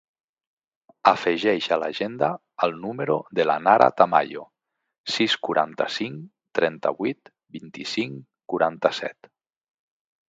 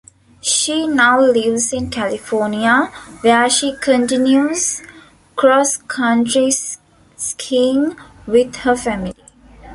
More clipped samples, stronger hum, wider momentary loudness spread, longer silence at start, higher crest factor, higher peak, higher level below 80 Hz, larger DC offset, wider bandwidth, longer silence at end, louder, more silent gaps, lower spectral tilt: neither; neither; first, 16 LU vs 12 LU; first, 1.05 s vs 0.45 s; first, 24 dB vs 14 dB; about the same, 0 dBFS vs -2 dBFS; second, -70 dBFS vs -48 dBFS; neither; second, 9 kHz vs 12 kHz; first, 1.15 s vs 0 s; second, -23 LUFS vs -15 LUFS; first, 4.98-5.04 s vs none; first, -4.5 dB/octave vs -2.5 dB/octave